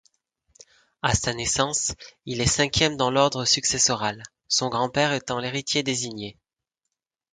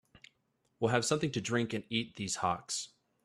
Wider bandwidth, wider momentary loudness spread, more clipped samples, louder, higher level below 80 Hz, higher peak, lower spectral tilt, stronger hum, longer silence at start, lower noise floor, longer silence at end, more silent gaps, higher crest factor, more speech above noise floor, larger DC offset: second, 10 kHz vs 14 kHz; first, 11 LU vs 7 LU; neither; first, -23 LUFS vs -34 LUFS; first, -46 dBFS vs -68 dBFS; first, -4 dBFS vs -14 dBFS; second, -2.5 dB/octave vs -4 dB/octave; neither; first, 1.05 s vs 0.8 s; first, -84 dBFS vs -77 dBFS; first, 1 s vs 0.35 s; neither; about the same, 22 dB vs 22 dB; first, 60 dB vs 44 dB; neither